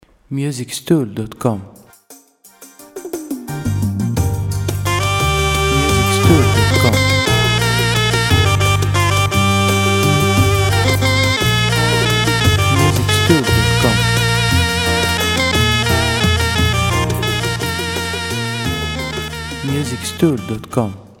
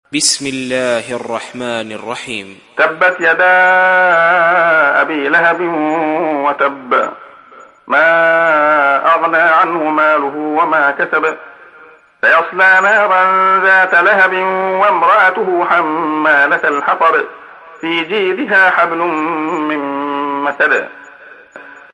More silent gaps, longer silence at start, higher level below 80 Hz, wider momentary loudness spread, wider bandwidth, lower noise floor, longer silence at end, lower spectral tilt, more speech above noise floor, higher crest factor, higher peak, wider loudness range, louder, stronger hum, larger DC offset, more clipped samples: neither; first, 0.3 s vs 0.1 s; first, -30 dBFS vs -64 dBFS; about the same, 9 LU vs 11 LU; first, 17 kHz vs 11.5 kHz; first, -45 dBFS vs -41 dBFS; about the same, 0.15 s vs 0.2 s; first, -4.5 dB/octave vs -2.5 dB/octave; about the same, 27 dB vs 29 dB; about the same, 16 dB vs 12 dB; about the same, 0 dBFS vs 0 dBFS; first, 9 LU vs 4 LU; second, -15 LUFS vs -12 LUFS; neither; neither; neither